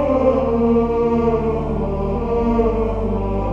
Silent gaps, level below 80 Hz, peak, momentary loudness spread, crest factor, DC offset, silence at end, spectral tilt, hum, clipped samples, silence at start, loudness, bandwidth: none; -28 dBFS; -4 dBFS; 5 LU; 14 dB; under 0.1%; 0 s; -10 dB/octave; none; under 0.1%; 0 s; -19 LUFS; 7 kHz